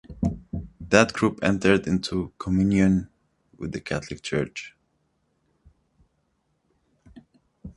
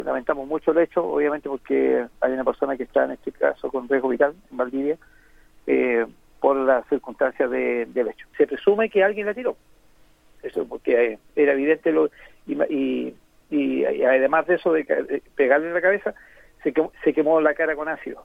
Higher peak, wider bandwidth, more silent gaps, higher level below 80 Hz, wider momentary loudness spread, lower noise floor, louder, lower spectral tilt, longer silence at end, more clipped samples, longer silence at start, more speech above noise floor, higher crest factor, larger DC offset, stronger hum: first, 0 dBFS vs -4 dBFS; first, 11.5 kHz vs 4.9 kHz; neither; first, -46 dBFS vs -56 dBFS; first, 17 LU vs 10 LU; first, -72 dBFS vs -54 dBFS; about the same, -24 LUFS vs -22 LUFS; about the same, -6 dB/octave vs -7 dB/octave; about the same, 0.05 s vs 0.05 s; neither; about the same, 0.1 s vs 0 s; first, 49 dB vs 33 dB; first, 26 dB vs 18 dB; neither; neither